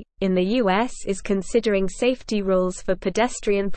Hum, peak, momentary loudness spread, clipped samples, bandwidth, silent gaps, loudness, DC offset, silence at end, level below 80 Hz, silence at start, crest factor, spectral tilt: none; -8 dBFS; 5 LU; under 0.1%; 8.8 kHz; none; -23 LUFS; under 0.1%; 0 s; -40 dBFS; 0 s; 14 dB; -5.5 dB/octave